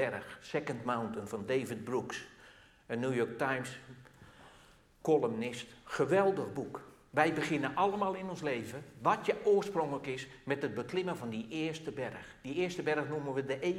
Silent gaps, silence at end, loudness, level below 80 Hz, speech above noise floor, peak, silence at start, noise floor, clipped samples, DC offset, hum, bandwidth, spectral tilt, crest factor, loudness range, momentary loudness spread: none; 0 s; -35 LUFS; -68 dBFS; 27 dB; -12 dBFS; 0 s; -61 dBFS; under 0.1%; under 0.1%; none; 14.5 kHz; -5.5 dB/octave; 24 dB; 5 LU; 12 LU